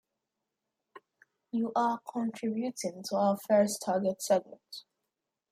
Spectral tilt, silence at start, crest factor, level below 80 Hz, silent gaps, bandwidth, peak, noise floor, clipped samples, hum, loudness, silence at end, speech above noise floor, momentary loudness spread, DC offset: -5 dB/octave; 0.95 s; 18 dB; -80 dBFS; none; 16 kHz; -14 dBFS; -87 dBFS; under 0.1%; none; -31 LUFS; 0.7 s; 56 dB; 15 LU; under 0.1%